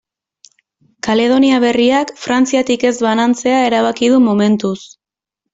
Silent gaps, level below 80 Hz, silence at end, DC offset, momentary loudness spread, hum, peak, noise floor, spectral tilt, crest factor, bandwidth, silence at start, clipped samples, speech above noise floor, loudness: none; -56 dBFS; 0.7 s; under 0.1%; 6 LU; none; -2 dBFS; -79 dBFS; -4.5 dB/octave; 12 dB; 7.8 kHz; 1.05 s; under 0.1%; 66 dB; -13 LUFS